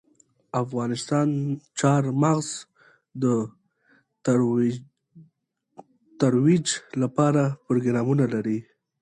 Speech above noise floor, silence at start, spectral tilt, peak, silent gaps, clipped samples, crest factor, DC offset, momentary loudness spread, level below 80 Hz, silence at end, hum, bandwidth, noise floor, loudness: 50 dB; 0.55 s; -6.5 dB/octave; -8 dBFS; none; under 0.1%; 18 dB; under 0.1%; 10 LU; -66 dBFS; 0.4 s; none; 11 kHz; -73 dBFS; -24 LUFS